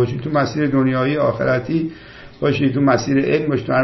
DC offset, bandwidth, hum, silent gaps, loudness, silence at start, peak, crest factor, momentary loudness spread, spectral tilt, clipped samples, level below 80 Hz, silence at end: under 0.1%; 6.2 kHz; none; none; -18 LUFS; 0 s; -2 dBFS; 16 dB; 6 LU; -7 dB/octave; under 0.1%; -48 dBFS; 0 s